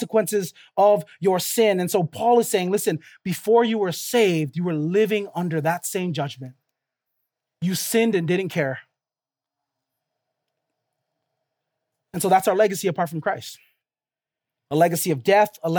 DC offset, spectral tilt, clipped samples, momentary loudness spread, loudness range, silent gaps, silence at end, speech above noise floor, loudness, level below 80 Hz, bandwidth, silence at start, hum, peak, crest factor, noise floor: under 0.1%; -5 dB/octave; under 0.1%; 10 LU; 6 LU; none; 0 s; over 69 dB; -22 LUFS; -74 dBFS; over 20 kHz; 0 s; none; -4 dBFS; 20 dB; under -90 dBFS